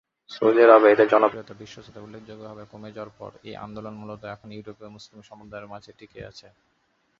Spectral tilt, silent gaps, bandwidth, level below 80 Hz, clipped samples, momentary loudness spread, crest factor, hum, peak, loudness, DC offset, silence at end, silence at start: -6.5 dB/octave; none; 7.2 kHz; -64 dBFS; under 0.1%; 28 LU; 22 dB; none; -2 dBFS; -17 LUFS; under 0.1%; 0.95 s; 0.35 s